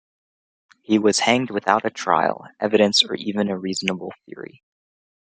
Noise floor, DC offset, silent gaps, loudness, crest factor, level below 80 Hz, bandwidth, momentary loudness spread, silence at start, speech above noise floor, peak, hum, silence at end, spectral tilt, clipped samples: under -90 dBFS; under 0.1%; none; -20 LUFS; 22 dB; -68 dBFS; 9.4 kHz; 19 LU; 0.9 s; over 69 dB; 0 dBFS; none; 0.9 s; -3.5 dB/octave; under 0.1%